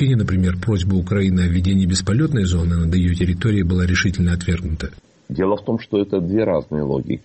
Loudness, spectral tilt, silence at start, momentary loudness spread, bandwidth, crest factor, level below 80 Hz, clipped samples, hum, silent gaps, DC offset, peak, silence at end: -19 LUFS; -6.5 dB/octave; 0 s; 5 LU; 8.8 kHz; 12 dB; -32 dBFS; under 0.1%; none; none; under 0.1%; -6 dBFS; 0.05 s